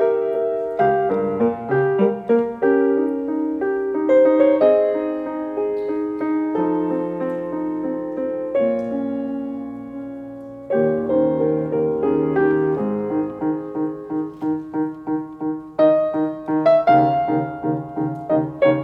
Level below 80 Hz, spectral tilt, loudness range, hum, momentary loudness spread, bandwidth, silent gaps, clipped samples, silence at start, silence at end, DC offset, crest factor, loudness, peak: -56 dBFS; -9.5 dB/octave; 6 LU; none; 11 LU; 5 kHz; none; under 0.1%; 0 s; 0 s; under 0.1%; 16 dB; -20 LUFS; -4 dBFS